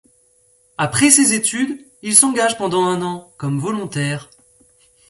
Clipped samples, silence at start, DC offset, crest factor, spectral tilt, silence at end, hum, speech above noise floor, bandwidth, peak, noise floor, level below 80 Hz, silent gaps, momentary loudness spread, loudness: under 0.1%; 0.8 s; under 0.1%; 18 dB; -3 dB/octave; 0.85 s; none; 40 dB; 16 kHz; 0 dBFS; -57 dBFS; -58 dBFS; none; 15 LU; -16 LUFS